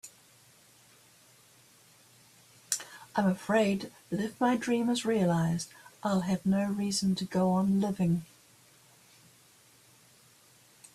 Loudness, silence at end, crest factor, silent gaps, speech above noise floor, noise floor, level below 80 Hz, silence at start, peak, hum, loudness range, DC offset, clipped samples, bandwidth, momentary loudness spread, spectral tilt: -30 LUFS; 2.7 s; 20 dB; none; 32 dB; -61 dBFS; -68 dBFS; 0.05 s; -12 dBFS; none; 7 LU; under 0.1%; under 0.1%; 14 kHz; 8 LU; -5.5 dB/octave